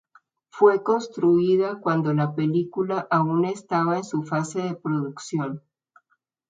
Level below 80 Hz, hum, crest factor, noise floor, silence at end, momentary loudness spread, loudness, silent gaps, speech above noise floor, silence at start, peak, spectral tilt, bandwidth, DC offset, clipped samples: -70 dBFS; none; 20 dB; -71 dBFS; 0.9 s; 9 LU; -23 LUFS; none; 49 dB; 0.55 s; -4 dBFS; -7 dB/octave; 9.2 kHz; under 0.1%; under 0.1%